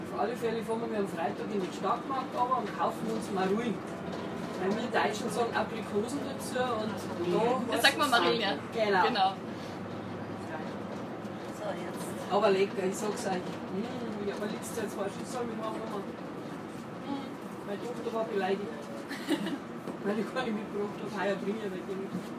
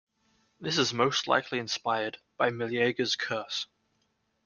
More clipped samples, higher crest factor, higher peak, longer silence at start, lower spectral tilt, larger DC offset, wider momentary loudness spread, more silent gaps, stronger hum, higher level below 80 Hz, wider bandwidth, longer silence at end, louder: neither; about the same, 24 dB vs 22 dB; about the same, -8 dBFS vs -10 dBFS; second, 0 s vs 0.6 s; about the same, -4.5 dB/octave vs -3.5 dB/octave; neither; first, 12 LU vs 9 LU; neither; neither; about the same, -72 dBFS vs -72 dBFS; first, 15.5 kHz vs 10 kHz; second, 0 s vs 0.8 s; second, -33 LUFS vs -29 LUFS